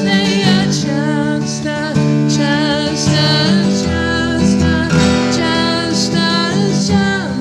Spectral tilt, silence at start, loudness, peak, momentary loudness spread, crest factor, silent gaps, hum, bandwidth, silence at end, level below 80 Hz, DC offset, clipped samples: -5 dB/octave; 0 s; -14 LUFS; 0 dBFS; 4 LU; 14 dB; none; none; 12 kHz; 0 s; -34 dBFS; under 0.1%; under 0.1%